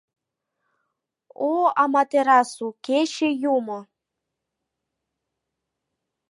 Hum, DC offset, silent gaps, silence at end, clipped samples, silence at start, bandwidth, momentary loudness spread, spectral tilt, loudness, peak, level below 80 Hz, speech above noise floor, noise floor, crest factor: none; under 0.1%; none; 2.45 s; under 0.1%; 1.4 s; 11.5 kHz; 12 LU; -3.5 dB/octave; -21 LUFS; -6 dBFS; -84 dBFS; 62 dB; -83 dBFS; 20 dB